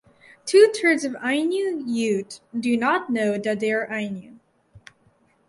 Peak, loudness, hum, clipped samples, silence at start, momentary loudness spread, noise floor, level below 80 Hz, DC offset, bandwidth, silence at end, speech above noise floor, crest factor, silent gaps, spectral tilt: -4 dBFS; -22 LUFS; none; under 0.1%; 0.45 s; 13 LU; -62 dBFS; -68 dBFS; under 0.1%; 11.5 kHz; 0.7 s; 40 dB; 20 dB; none; -4.5 dB/octave